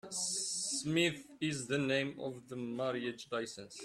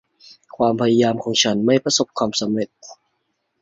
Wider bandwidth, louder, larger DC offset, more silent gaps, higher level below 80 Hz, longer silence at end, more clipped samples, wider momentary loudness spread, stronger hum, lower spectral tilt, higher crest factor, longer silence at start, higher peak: first, 13.5 kHz vs 7.8 kHz; second, -36 LUFS vs -18 LUFS; neither; neither; second, -74 dBFS vs -60 dBFS; second, 0 s vs 0.7 s; neither; first, 10 LU vs 6 LU; neither; about the same, -3 dB/octave vs -4 dB/octave; about the same, 18 dB vs 18 dB; second, 0.05 s vs 0.6 s; second, -20 dBFS vs -2 dBFS